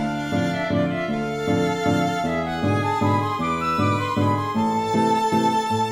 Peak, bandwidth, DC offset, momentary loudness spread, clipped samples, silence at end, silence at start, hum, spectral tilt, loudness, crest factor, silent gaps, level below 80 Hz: -8 dBFS; 16 kHz; under 0.1%; 4 LU; under 0.1%; 0 s; 0 s; none; -6 dB/octave; -22 LUFS; 14 dB; none; -50 dBFS